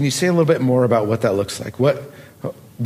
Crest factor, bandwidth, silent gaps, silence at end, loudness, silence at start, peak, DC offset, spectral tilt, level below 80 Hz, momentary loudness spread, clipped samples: 16 dB; 15.5 kHz; none; 0 s; -18 LUFS; 0 s; -2 dBFS; under 0.1%; -6 dB/octave; -58 dBFS; 16 LU; under 0.1%